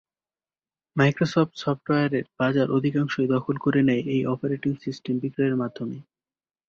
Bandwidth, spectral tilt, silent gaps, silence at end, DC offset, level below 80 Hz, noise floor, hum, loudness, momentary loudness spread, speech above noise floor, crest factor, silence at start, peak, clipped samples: 7 kHz; -7.5 dB/octave; none; 0.65 s; under 0.1%; -62 dBFS; under -90 dBFS; none; -24 LUFS; 9 LU; over 66 dB; 18 dB; 0.95 s; -6 dBFS; under 0.1%